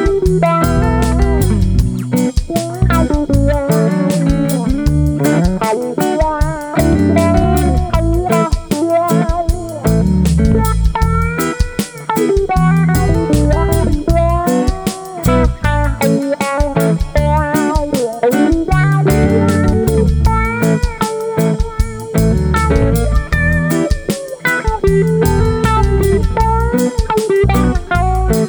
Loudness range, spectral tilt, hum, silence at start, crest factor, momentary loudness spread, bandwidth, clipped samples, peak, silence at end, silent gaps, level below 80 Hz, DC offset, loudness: 2 LU; -6.5 dB/octave; none; 0 s; 12 dB; 5 LU; over 20 kHz; under 0.1%; 0 dBFS; 0 s; none; -18 dBFS; under 0.1%; -14 LUFS